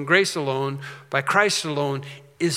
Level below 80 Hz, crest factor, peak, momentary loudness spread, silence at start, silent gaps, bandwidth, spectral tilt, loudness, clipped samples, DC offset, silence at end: -76 dBFS; 22 dB; -2 dBFS; 13 LU; 0 s; none; 16 kHz; -4 dB/octave; -23 LUFS; under 0.1%; under 0.1%; 0 s